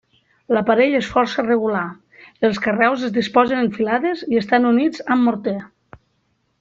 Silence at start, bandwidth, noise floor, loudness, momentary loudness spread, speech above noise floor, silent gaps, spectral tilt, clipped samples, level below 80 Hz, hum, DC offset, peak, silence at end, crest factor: 0.5 s; 7.6 kHz; -67 dBFS; -18 LUFS; 6 LU; 49 dB; none; -6 dB/octave; under 0.1%; -56 dBFS; none; under 0.1%; -2 dBFS; 0.95 s; 18 dB